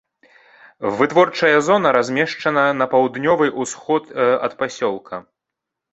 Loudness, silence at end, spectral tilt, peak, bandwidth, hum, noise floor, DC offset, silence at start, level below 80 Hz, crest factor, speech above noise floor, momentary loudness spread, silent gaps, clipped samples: -18 LUFS; 0.7 s; -4.5 dB/octave; 0 dBFS; 8.2 kHz; none; -82 dBFS; under 0.1%; 0.8 s; -62 dBFS; 18 dB; 65 dB; 11 LU; none; under 0.1%